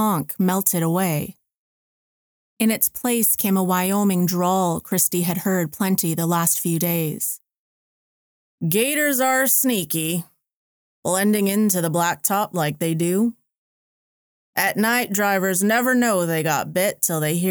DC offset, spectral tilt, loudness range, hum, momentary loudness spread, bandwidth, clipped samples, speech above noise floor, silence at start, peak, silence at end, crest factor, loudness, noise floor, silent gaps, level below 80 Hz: under 0.1%; -4 dB/octave; 3 LU; none; 6 LU; over 20 kHz; under 0.1%; over 70 dB; 0 s; -4 dBFS; 0 s; 18 dB; -20 LUFS; under -90 dBFS; 1.57-2.57 s, 7.58-8.58 s, 10.56-11.03 s, 13.57-14.53 s; -64 dBFS